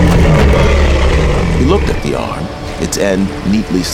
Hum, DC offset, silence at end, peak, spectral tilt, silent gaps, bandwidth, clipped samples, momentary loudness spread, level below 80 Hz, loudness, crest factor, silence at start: none; under 0.1%; 0 s; 0 dBFS; -6 dB/octave; none; 15.5 kHz; under 0.1%; 10 LU; -16 dBFS; -13 LUFS; 10 dB; 0 s